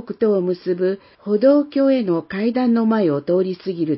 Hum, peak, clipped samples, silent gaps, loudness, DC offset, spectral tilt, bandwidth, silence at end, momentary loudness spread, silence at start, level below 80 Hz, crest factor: none; -4 dBFS; under 0.1%; none; -19 LUFS; under 0.1%; -12 dB/octave; 5.8 kHz; 0 s; 8 LU; 0 s; -66 dBFS; 14 dB